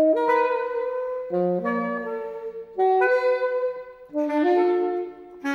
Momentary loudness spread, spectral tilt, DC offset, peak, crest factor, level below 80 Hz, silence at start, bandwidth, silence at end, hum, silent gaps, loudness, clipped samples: 13 LU; -7.5 dB/octave; under 0.1%; -10 dBFS; 14 dB; -66 dBFS; 0 s; 6.8 kHz; 0 s; none; none; -24 LUFS; under 0.1%